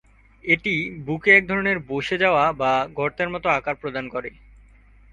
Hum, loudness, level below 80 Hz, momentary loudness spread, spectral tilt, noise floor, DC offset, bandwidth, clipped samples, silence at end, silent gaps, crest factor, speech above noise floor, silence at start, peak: none; -21 LUFS; -52 dBFS; 14 LU; -6 dB/octave; -51 dBFS; under 0.1%; 10 kHz; under 0.1%; 0.85 s; none; 20 dB; 29 dB; 0.45 s; -2 dBFS